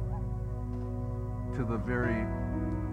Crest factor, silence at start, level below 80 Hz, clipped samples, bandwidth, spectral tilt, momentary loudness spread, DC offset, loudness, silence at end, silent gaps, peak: 16 dB; 0 s; -38 dBFS; under 0.1%; 7.6 kHz; -9.5 dB/octave; 6 LU; under 0.1%; -34 LUFS; 0 s; none; -16 dBFS